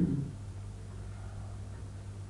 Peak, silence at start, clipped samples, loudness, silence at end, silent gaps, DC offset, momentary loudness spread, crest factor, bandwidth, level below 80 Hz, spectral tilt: -18 dBFS; 0 s; under 0.1%; -42 LUFS; 0 s; none; under 0.1%; 8 LU; 20 dB; 11.5 kHz; -50 dBFS; -8 dB/octave